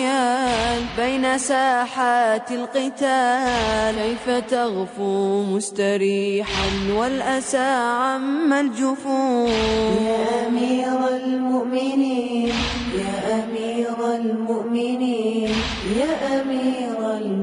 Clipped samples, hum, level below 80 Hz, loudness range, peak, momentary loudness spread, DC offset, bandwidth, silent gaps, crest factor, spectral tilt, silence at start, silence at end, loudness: under 0.1%; none; -44 dBFS; 2 LU; -8 dBFS; 5 LU; under 0.1%; 10.5 kHz; none; 12 dB; -4.5 dB/octave; 0 s; 0 s; -21 LUFS